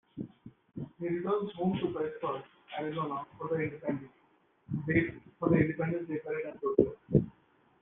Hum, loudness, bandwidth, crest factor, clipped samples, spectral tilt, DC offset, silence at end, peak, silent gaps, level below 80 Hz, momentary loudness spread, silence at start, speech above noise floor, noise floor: none; -33 LUFS; 3.9 kHz; 24 dB; under 0.1%; -7 dB/octave; under 0.1%; 0.5 s; -10 dBFS; none; -60 dBFS; 15 LU; 0.15 s; 36 dB; -68 dBFS